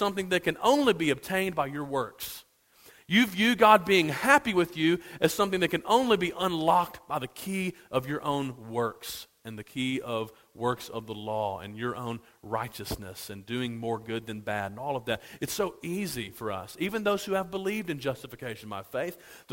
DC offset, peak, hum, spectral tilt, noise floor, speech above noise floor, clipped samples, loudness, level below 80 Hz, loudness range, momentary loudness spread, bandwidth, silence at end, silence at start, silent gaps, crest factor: under 0.1%; -6 dBFS; none; -4.5 dB/octave; -58 dBFS; 29 dB; under 0.1%; -28 LUFS; -60 dBFS; 11 LU; 15 LU; 16.5 kHz; 0 s; 0 s; none; 24 dB